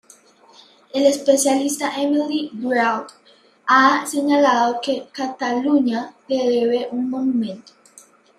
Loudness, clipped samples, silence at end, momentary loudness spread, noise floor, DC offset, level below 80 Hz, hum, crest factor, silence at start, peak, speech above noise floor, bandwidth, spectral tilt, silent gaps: -19 LUFS; under 0.1%; 0.75 s; 12 LU; -50 dBFS; under 0.1%; -72 dBFS; none; 18 dB; 0.95 s; -2 dBFS; 31 dB; 15 kHz; -3 dB/octave; none